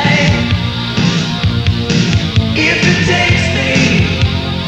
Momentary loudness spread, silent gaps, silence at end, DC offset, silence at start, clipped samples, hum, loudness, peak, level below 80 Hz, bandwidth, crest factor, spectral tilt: 4 LU; none; 0 s; under 0.1%; 0 s; under 0.1%; none; -12 LUFS; 0 dBFS; -28 dBFS; 9.2 kHz; 12 dB; -5 dB/octave